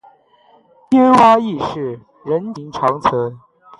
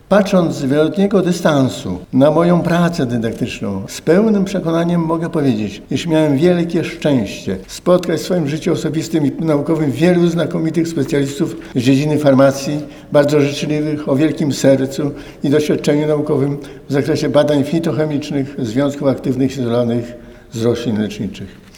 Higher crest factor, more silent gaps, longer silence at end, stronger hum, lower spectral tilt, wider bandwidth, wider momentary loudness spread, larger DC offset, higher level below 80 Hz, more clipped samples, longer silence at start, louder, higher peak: about the same, 16 dB vs 14 dB; neither; first, 0.4 s vs 0.2 s; neither; about the same, -6.5 dB/octave vs -6.5 dB/octave; second, 11 kHz vs 18 kHz; first, 17 LU vs 9 LU; neither; second, -52 dBFS vs -46 dBFS; neither; first, 0.9 s vs 0.1 s; about the same, -15 LUFS vs -16 LUFS; about the same, 0 dBFS vs 0 dBFS